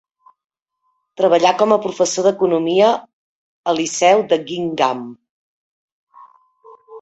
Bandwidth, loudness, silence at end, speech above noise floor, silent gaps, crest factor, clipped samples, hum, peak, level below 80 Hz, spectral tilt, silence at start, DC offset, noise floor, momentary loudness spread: 8.2 kHz; -16 LUFS; 0 s; 54 dB; 3.13-3.64 s, 5.29-6.07 s; 18 dB; under 0.1%; none; 0 dBFS; -64 dBFS; -3.5 dB/octave; 1.2 s; under 0.1%; -69 dBFS; 10 LU